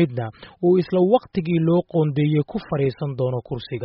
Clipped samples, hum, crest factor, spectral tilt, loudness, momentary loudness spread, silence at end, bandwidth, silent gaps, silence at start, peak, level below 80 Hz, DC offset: under 0.1%; none; 16 dB; -8 dB/octave; -21 LUFS; 9 LU; 0 s; 5.6 kHz; none; 0 s; -4 dBFS; -54 dBFS; under 0.1%